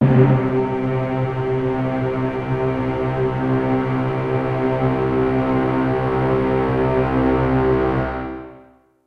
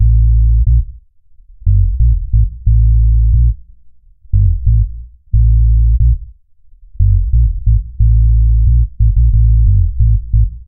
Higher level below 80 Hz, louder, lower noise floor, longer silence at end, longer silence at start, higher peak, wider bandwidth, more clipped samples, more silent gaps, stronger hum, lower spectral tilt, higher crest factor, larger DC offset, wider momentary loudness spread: second, -36 dBFS vs -12 dBFS; second, -19 LUFS vs -13 LUFS; first, -49 dBFS vs -43 dBFS; first, 0.45 s vs 0.05 s; about the same, 0 s vs 0 s; about the same, -2 dBFS vs 0 dBFS; first, 5.2 kHz vs 0.3 kHz; neither; neither; neither; second, -10 dB/octave vs -18.5 dB/octave; first, 16 dB vs 10 dB; second, under 0.1% vs 0.4%; about the same, 4 LU vs 6 LU